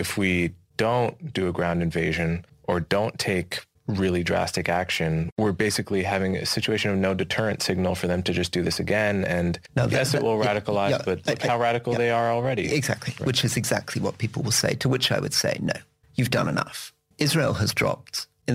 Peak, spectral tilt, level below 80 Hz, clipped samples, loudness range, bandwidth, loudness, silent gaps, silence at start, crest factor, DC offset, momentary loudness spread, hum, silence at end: -6 dBFS; -4.5 dB/octave; -50 dBFS; under 0.1%; 2 LU; 16 kHz; -25 LUFS; 5.32-5.36 s; 0 s; 20 dB; under 0.1%; 6 LU; none; 0 s